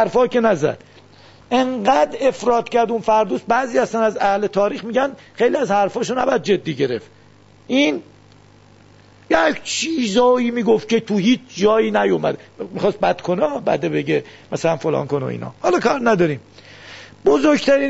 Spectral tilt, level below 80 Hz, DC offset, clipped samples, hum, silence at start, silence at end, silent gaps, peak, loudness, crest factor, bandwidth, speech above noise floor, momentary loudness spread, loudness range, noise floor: -5 dB/octave; -54 dBFS; 0.1%; under 0.1%; none; 0 s; 0 s; none; -2 dBFS; -18 LUFS; 16 dB; 8 kHz; 31 dB; 7 LU; 3 LU; -49 dBFS